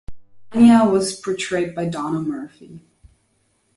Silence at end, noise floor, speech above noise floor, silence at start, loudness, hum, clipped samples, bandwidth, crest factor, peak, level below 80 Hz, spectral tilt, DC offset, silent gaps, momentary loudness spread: 1 s; -65 dBFS; 47 dB; 0.1 s; -18 LUFS; none; under 0.1%; 11.5 kHz; 18 dB; -2 dBFS; -52 dBFS; -5.5 dB/octave; under 0.1%; none; 16 LU